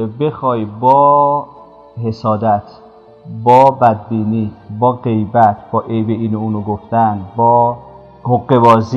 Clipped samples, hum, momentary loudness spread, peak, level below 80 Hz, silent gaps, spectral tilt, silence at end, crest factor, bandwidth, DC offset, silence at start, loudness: 0.3%; none; 12 LU; 0 dBFS; -46 dBFS; none; -9 dB/octave; 0 s; 14 dB; 8 kHz; under 0.1%; 0 s; -14 LUFS